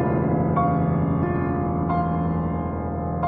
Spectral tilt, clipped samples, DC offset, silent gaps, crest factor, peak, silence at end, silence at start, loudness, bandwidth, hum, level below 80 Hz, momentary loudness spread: -10 dB/octave; under 0.1%; under 0.1%; none; 14 dB; -10 dBFS; 0 s; 0 s; -23 LUFS; 3.6 kHz; none; -38 dBFS; 6 LU